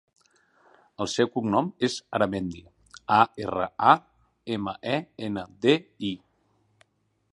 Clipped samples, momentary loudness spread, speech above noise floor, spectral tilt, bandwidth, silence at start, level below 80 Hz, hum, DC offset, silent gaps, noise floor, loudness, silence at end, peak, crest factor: under 0.1%; 12 LU; 43 dB; -5 dB/octave; 11.5 kHz; 1 s; -60 dBFS; none; under 0.1%; none; -68 dBFS; -26 LUFS; 1.15 s; -4 dBFS; 24 dB